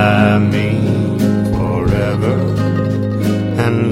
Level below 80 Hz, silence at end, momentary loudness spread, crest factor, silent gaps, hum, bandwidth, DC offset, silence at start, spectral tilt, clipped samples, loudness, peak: -32 dBFS; 0 s; 5 LU; 14 dB; none; none; 15 kHz; under 0.1%; 0 s; -8 dB/octave; under 0.1%; -15 LUFS; 0 dBFS